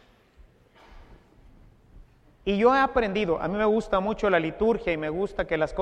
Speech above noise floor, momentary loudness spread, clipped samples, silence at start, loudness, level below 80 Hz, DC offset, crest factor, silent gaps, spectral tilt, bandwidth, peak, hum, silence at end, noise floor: 32 dB; 8 LU; under 0.1%; 0.4 s; -25 LUFS; -46 dBFS; under 0.1%; 20 dB; none; -6.5 dB/octave; 9.2 kHz; -8 dBFS; none; 0 s; -56 dBFS